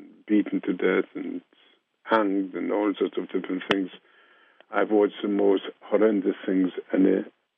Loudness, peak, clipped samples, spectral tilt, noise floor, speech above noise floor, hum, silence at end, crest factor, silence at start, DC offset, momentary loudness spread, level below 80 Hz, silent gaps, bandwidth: -25 LUFS; -6 dBFS; under 0.1%; -4.5 dB/octave; -58 dBFS; 34 dB; none; 0.3 s; 20 dB; 0 s; under 0.1%; 9 LU; -82 dBFS; none; 6.2 kHz